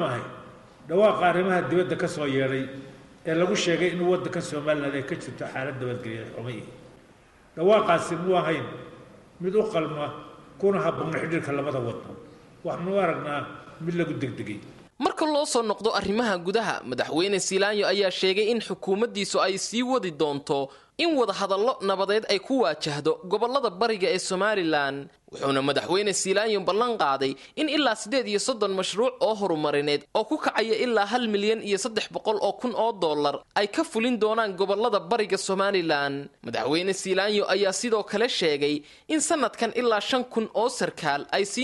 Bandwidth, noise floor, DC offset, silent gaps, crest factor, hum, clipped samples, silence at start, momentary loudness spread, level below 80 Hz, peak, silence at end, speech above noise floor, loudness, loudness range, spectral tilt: 11.5 kHz; -55 dBFS; under 0.1%; none; 16 dB; none; under 0.1%; 0 s; 10 LU; -64 dBFS; -8 dBFS; 0 s; 30 dB; -25 LUFS; 4 LU; -4 dB/octave